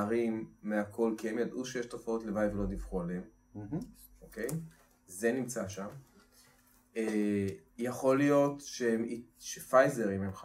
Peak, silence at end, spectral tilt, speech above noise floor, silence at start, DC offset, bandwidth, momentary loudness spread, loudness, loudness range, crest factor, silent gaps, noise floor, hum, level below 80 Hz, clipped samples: -12 dBFS; 0 s; -6 dB/octave; 32 dB; 0 s; under 0.1%; 16 kHz; 16 LU; -34 LUFS; 9 LU; 22 dB; none; -65 dBFS; none; -56 dBFS; under 0.1%